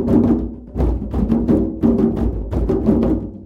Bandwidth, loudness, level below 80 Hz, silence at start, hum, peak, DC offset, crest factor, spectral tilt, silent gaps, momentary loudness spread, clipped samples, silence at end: 5.2 kHz; -18 LUFS; -24 dBFS; 0 s; none; -2 dBFS; under 0.1%; 14 dB; -11 dB/octave; none; 6 LU; under 0.1%; 0 s